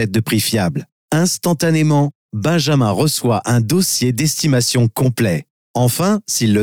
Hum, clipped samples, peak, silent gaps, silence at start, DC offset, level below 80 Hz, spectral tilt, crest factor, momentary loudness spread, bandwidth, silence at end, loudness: none; under 0.1%; -6 dBFS; 0.92-1.08 s, 2.15-2.29 s, 5.50-5.74 s; 0 s; 0.4%; -52 dBFS; -5 dB/octave; 10 dB; 6 LU; 19.5 kHz; 0 s; -16 LUFS